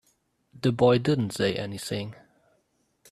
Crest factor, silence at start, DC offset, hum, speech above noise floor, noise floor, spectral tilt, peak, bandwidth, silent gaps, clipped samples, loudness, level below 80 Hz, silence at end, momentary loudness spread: 20 dB; 0.55 s; under 0.1%; none; 46 dB; -71 dBFS; -6 dB/octave; -8 dBFS; 14 kHz; none; under 0.1%; -26 LUFS; -60 dBFS; 1 s; 12 LU